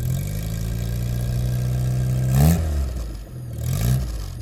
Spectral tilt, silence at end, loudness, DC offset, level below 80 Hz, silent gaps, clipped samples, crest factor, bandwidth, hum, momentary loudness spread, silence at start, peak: -6.5 dB/octave; 0 s; -23 LUFS; under 0.1%; -28 dBFS; none; under 0.1%; 16 dB; 17 kHz; none; 12 LU; 0 s; -4 dBFS